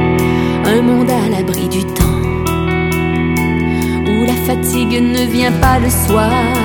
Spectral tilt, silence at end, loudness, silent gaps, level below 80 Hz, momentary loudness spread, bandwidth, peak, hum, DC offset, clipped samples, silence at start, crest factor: -5.5 dB/octave; 0 s; -13 LUFS; none; -26 dBFS; 4 LU; over 20 kHz; 0 dBFS; none; under 0.1%; under 0.1%; 0 s; 12 dB